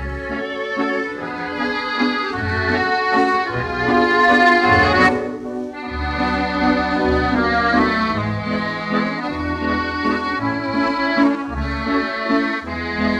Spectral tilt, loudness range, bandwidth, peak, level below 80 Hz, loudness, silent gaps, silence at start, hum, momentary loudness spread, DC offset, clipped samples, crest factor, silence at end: -6 dB/octave; 5 LU; 10.5 kHz; -2 dBFS; -36 dBFS; -18 LUFS; none; 0 s; none; 11 LU; under 0.1%; under 0.1%; 16 dB; 0 s